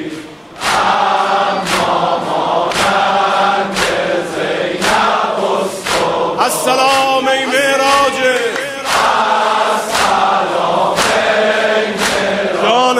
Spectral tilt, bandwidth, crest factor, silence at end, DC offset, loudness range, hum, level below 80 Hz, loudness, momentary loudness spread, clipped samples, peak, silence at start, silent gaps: -2.5 dB/octave; 16 kHz; 14 dB; 0 s; under 0.1%; 2 LU; none; -46 dBFS; -13 LUFS; 5 LU; under 0.1%; 0 dBFS; 0 s; none